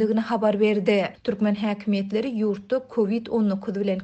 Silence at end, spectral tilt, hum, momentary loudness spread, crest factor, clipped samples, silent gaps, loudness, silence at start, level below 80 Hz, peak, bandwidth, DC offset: 0 s; -8 dB/octave; none; 6 LU; 16 dB; under 0.1%; none; -24 LUFS; 0 s; -64 dBFS; -8 dBFS; 8.2 kHz; under 0.1%